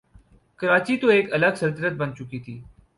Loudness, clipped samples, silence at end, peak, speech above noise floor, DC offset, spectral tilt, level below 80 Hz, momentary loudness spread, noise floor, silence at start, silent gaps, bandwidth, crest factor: -22 LUFS; under 0.1%; 0.35 s; -6 dBFS; 32 dB; under 0.1%; -6.5 dB/octave; -58 dBFS; 17 LU; -54 dBFS; 0.6 s; none; 11.5 kHz; 18 dB